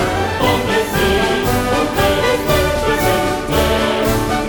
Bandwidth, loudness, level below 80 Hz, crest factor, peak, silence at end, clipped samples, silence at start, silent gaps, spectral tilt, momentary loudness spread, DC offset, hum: over 20 kHz; -15 LUFS; -28 dBFS; 14 dB; -2 dBFS; 0 s; under 0.1%; 0 s; none; -4.5 dB/octave; 2 LU; under 0.1%; none